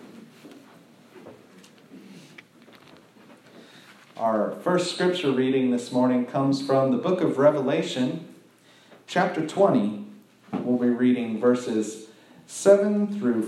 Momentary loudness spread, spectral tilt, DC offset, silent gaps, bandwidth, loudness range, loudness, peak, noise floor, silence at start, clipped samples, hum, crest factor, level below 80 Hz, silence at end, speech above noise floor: 11 LU; -6 dB/octave; under 0.1%; none; 12.5 kHz; 6 LU; -23 LUFS; -4 dBFS; -55 dBFS; 0.05 s; under 0.1%; none; 20 dB; -80 dBFS; 0 s; 32 dB